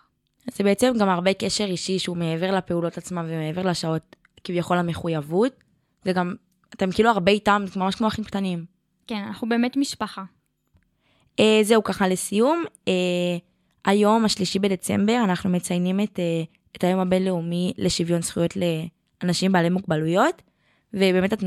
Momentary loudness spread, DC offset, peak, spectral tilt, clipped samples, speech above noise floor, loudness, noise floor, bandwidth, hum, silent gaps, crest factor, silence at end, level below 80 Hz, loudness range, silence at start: 11 LU; under 0.1%; -4 dBFS; -5.5 dB/octave; under 0.1%; 43 dB; -23 LUFS; -65 dBFS; 14.5 kHz; none; none; 20 dB; 0 s; -56 dBFS; 4 LU; 0.45 s